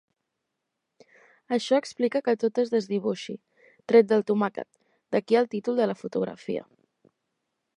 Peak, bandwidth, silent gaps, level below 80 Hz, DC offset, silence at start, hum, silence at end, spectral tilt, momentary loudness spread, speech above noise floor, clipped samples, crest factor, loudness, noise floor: -6 dBFS; 10.5 kHz; none; -78 dBFS; under 0.1%; 1.5 s; none; 1.15 s; -6 dB/octave; 14 LU; 57 dB; under 0.1%; 22 dB; -26 LUFS; -82 dBFS